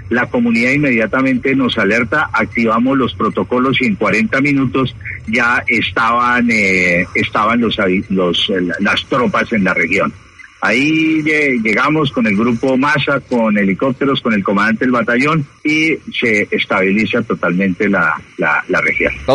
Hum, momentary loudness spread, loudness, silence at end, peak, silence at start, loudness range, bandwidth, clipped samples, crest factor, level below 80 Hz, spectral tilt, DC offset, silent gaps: none; 4 LU; -14 LUFS; 0 s; 0 dBFS; 0 s; 1 LU; 11 kHz; under 0.1%; 14 dB; -44 dBFS; -5.5 dB/octave; under 0.1%; none